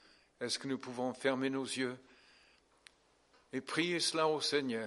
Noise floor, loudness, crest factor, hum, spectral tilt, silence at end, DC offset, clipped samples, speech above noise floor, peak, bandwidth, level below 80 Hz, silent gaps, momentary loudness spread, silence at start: -70 dBFS; -36 LUFS; 20 dB; none; -3 dB/octave; 0 s; under 0.1%; under 0.1%; 34 dB; -18 dBFS; 11.5 kHz; -82 dBFS; none; 12 LU; 0.4 s